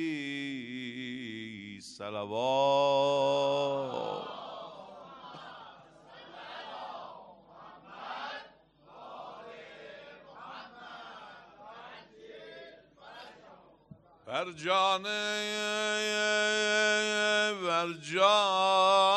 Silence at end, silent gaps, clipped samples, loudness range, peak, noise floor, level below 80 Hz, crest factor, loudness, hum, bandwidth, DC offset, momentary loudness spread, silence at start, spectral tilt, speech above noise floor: 0 s; none; under 0.1%; 20 LU; -12 dBFS; -58 dBFS; -78 dBFS; 20 dB; -29 LUFS; none; 12 kHz; under 0.1%; 24 LU; 0 s; -2.5 dB/octave; 31 dB